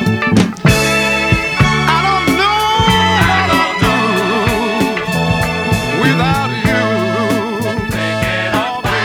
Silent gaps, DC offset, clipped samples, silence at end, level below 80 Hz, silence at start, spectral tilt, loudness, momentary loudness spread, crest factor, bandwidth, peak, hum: none; under 0.1%; under 0.1%; 0 s; -32 dBFS; 0 s; -5 dB/octave; -13 LUFS; 5 LU; 12 dB; 19.5 kHz; 0 dBFS; none